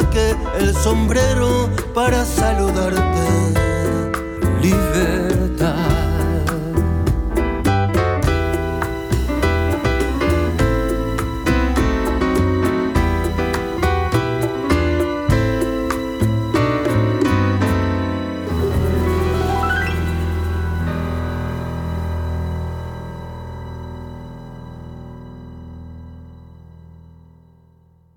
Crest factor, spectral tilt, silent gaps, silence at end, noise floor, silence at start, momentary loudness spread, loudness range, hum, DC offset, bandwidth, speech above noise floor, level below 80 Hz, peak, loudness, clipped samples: 14 dB; -6 dB/octave; none; 1.4 s; -52 dBFS; 0 s; 15 LU; 14 LU; none; under 0.1%; 19.5 kHz; 36 dB; -26 dBFS; -4 dBFS; -19 LUFS; under 0.1%